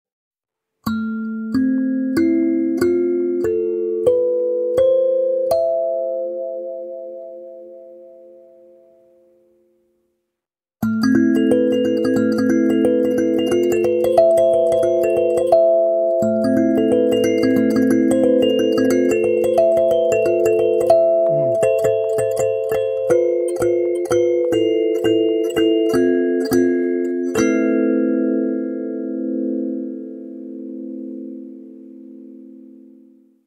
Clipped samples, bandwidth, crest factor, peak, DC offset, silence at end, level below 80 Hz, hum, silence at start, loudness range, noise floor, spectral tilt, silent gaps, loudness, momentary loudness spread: under 0.1%; 16 kHz; 18 dB; 0 dBFS; under 0.1%; 0.8 s; -56 dBFS; none; 0.85 s; 11 LU; -84 dBFS; -6 dB/octave; none; -17 LUFS; 14 LU